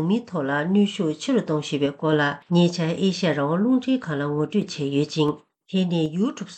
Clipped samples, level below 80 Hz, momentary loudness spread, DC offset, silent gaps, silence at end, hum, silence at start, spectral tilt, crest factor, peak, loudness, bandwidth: under 0.1%; -66 dBFS; 5 LU; under 0.1%; none; 0 s; none; 0 s; -6.5 dB/octave; 16 dB; -8 dBFS; -23 LUFS; 8.8 kHz